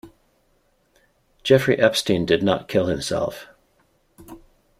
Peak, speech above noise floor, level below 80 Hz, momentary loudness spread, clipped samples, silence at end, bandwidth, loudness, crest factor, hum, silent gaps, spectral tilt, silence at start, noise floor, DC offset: -2 dBFS; 44 dB; -52 dBFS; 11 LU; under 0.1%; 0.4 s; 15.5 kHz; -20 LUFS; 22 dB; none; none; -5 dB/octave; 0.05 s; -64 dBFS; under 0.1%